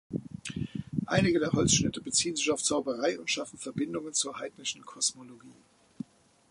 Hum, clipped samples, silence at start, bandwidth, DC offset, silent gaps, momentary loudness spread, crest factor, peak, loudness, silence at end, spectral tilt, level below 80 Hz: none; under 0.1%; 0.1 s; 11.5 kHz; under 0.1%; none; 14 LU; 20 dB; -12 dBFS; -30 LUFS; 1 s; -3.5 dB/octave; -56 dBFS